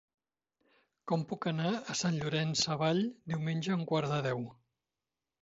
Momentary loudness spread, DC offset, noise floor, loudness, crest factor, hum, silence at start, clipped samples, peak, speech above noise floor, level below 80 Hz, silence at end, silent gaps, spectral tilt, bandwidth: 6 LU; under 0.1%; under -90 dBFS; -33 LUFS; 18 dB; none; 1.05 s; under 0.1%; -16 dBFS; over 57 dB; -72 dBFS; 0.9 s; none; -5 dB/octave; 7.6 kHz